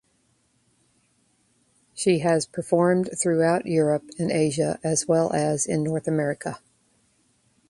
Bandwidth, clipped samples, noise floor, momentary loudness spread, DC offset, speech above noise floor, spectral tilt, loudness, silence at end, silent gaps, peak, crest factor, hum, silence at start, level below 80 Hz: 11.5 kHz; under 0.1%; -67 dBFS; 6 LU; under 0.1%; 44 dB; -5.5 dB/octave; -23 LUFS; 1.15 s; none; -6 dBFS; 18 dB; none; 1.95 s; -62 dBFS